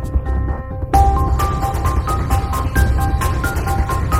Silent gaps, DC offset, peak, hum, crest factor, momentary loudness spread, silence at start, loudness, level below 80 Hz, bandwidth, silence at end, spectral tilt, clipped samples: none; under 0.1%; 0 dBFS; none; 16 dB; 6 LU; 0 s; -18 LUFS; -20 dBFS; 16.5 kHz; 0 s; -6 dB/octave; under 0.1%